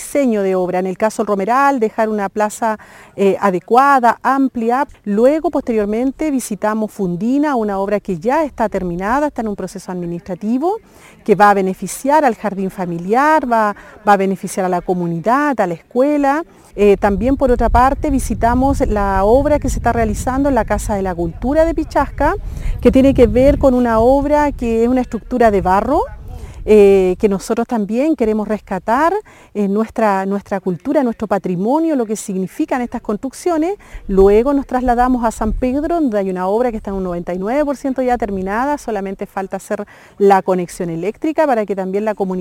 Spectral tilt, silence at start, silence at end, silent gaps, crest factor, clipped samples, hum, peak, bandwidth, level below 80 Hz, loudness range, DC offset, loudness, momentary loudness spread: -6.5 dB/octave; 0 s; 0 s; none; 14 dB; under 0.1%; none; 0 dBFS; 17 kHz; -30 dBFS; 5 LU; under 0.1%; -16 LUFS; 10 LU